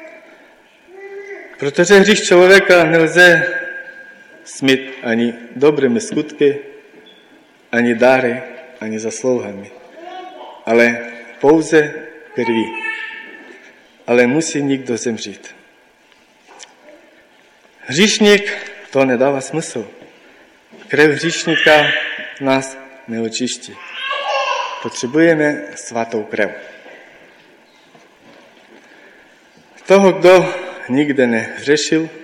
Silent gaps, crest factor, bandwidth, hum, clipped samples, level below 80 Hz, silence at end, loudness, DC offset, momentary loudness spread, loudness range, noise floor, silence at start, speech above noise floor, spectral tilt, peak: none; 16 dB; 16.5 kHz; none; under 0.1%; -58 dBFS; 0 s; -14 LUFS; under 0.1%; 22 LU; 9 LU; -51 dBFS; 0 s; 37 dB; -4 dB/octave; 0 dBFS